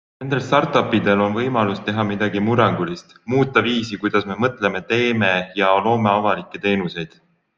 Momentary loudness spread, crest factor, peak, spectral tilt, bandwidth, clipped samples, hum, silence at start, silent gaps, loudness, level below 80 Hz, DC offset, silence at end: 7 LU; 18 dB; -2 dBFS; -6.5 dB/octave; 7.4 kHz; under 0.1%; none; 0.2 s; none; -19 LUFS; -56 dBFS; under 0.1%; 0.5 s